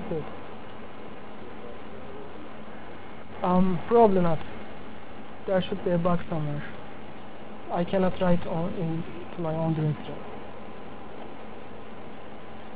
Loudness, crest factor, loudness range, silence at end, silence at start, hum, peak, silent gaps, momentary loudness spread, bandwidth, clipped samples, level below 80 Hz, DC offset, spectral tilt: -27 LUFS; 22 dB; 8 LU; 0 s; 0 s; none; -8 dBFS; none; 19 LU; 4 kHz; under 0.1%; -52 dBFS; 2%; -11.5 dB/octave